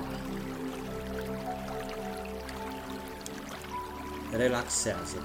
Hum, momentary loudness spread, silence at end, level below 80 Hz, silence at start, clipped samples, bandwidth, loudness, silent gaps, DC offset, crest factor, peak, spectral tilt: none; 11 LU; 0 s; -50 dBFS; 0 s; under 0.1%; 16.5 kHz; -35 LUFS; none; under 0.1%; 20 dB; -14 dBFS; -4 dB/octave